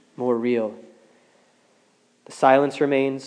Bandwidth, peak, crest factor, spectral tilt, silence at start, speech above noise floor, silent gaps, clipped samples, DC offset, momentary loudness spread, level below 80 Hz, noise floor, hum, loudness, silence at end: 10.5 kHz; -2 dBFS; 20 dB; -6 dB/octave; 0.2 s; 41 dB; none; under 0.1%; under 0.1%; 11 LU; -88 dBFS; -62 dBFS; none; -21 LUFS; 0 s